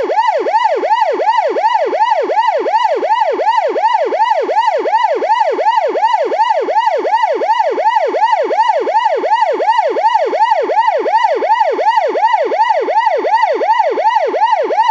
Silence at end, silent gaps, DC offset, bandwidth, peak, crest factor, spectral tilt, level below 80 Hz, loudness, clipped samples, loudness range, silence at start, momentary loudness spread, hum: 0 s; none; under 0.1%; 7.6 kHz; -2 dBFS; 12 dB; -1.5 dB/octave; -78 dBFS; -13 LUFS; under 0.1%; 1 LU; 0 s; 1 LU; none